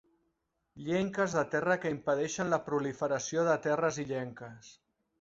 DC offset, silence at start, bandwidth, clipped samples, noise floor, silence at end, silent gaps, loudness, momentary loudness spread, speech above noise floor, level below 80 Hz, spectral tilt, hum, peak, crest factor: under 0.1%; 0.75 s; 8 kHz; under 0.1%; -80 dBFS; 0.5 s; none; -32 LUFS; 9 LU; 48 dB; -68 dBFS; -5 dB/octave; none; -14 dBFS; 18 dB